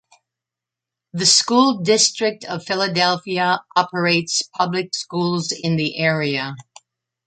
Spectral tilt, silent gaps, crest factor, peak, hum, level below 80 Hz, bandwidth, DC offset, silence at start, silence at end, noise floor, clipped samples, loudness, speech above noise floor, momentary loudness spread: -3 dB/octave; none; 18 dB; -2 dBFS; none; -66 dBFS; 9.4 kHz; under 0.1%; 1.15 s; 0.65 s; -87 dBFS; under 0.1%; -18 LUFS; 67 dB; 11 LU